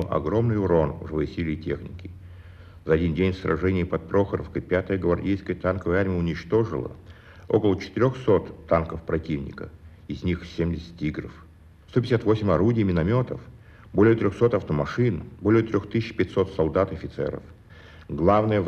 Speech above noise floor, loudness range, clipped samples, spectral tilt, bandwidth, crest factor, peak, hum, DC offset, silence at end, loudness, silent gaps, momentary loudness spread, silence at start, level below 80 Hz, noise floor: 23 dB; 4 LU; under 0.1%; -8.5 dB/octave; 7.8 kHz; 20 dB; -4 dBFS; none; under 0.1%; 0 s; -25 LUFS; none; 11 LU; 0 s; -44 dBFS; -47 dBFS